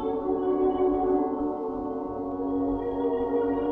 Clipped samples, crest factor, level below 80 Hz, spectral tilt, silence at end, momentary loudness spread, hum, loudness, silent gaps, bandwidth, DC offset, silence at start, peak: under 0.1%; 12 dB; -48 dBFS; -10 dB/octave; 0 s; 8 LU; none; -27 LUFS; none; 3.8 kHz; under 0.1%; 0 s; -14 dBFS